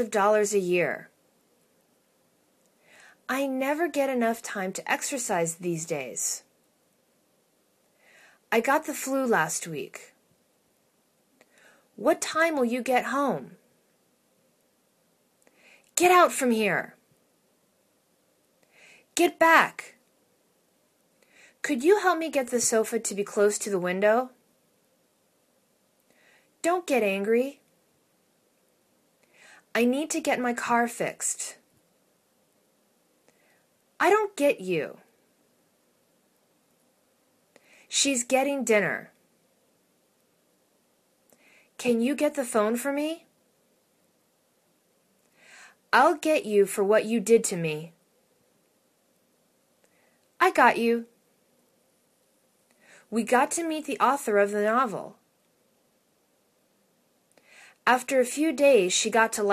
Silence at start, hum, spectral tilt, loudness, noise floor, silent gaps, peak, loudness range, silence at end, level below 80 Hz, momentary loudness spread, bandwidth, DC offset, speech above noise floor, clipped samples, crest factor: 0 s; none; -3 dB/octave; -25 LUFS; -69 dBFS; none; -2 dBFS; 7 LU; 0 s; -78 dBFS; 11 LU; 14 kHz; under 0.1%; 44 dB; under 0.1%; 26 dB